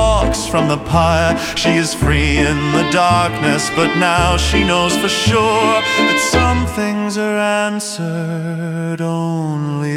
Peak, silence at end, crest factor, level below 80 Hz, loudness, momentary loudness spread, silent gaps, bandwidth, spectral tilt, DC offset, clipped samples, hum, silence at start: 0 dBFS; 0 s; 14 dB; -28 dBFS; -15 LUFS; 8 LU; none; 17 kHz; -4.5 dB/octave; under 0.1%; under 0.1%; none; 0 s